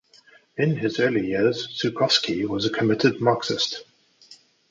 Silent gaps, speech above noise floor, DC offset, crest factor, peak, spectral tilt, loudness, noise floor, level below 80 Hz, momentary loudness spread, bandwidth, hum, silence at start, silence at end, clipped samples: none; 32 dB; under 0.1%; 20 dB; -4 dBFS; -5 dB/octave; -23 LUFS; -55 dBFS; -60 dBFS; 6 LU; 7.8 kHz; none; 0.55 s; 0.35 s; under 0.1%